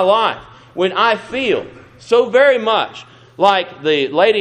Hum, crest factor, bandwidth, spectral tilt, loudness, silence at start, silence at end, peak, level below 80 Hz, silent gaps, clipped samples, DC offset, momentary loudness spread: none; 16 dB; 9.6 kHz; -4.5 dB/octave; -15 LUFS; 0 s; 0 s; 0 dBFS; -58 dBFS; none; under 0.1%; under 0.1%; 15 LU